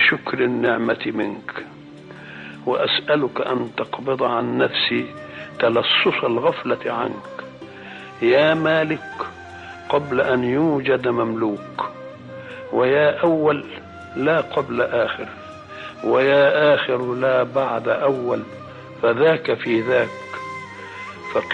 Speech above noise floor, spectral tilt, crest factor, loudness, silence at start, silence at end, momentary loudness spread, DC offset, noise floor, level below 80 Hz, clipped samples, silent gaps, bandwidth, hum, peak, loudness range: 20 dB; -6.5 dB/octave; 16 dB; -20 LUFS; 0 s; 0 s; 19 LU; under 0.1%; -40 dBFS; -60 dBFS; under 0.1%; none; 8.2 kHz; none; -6 dBFS; 3 LU